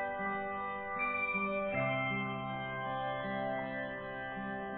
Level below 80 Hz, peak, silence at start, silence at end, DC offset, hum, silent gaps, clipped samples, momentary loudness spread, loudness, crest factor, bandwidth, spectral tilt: -64 dBFS; -22 dBFS; 0 s; 0 s; under 0.1%; none; none; under 0.1%; 7 LU; -36 LUFS; 14 dB; 4.5 kHz; -4 dB/octave